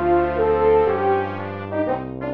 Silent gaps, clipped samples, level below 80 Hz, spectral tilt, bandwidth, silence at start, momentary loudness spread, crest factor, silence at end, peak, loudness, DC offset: none; under 0.1%; -40 dBFS; -10 dB/octave; 5 kHz; 0 s; 10 LU; 14 dB; 0 s; -6 dBFS; -20 LUFS; 0.5%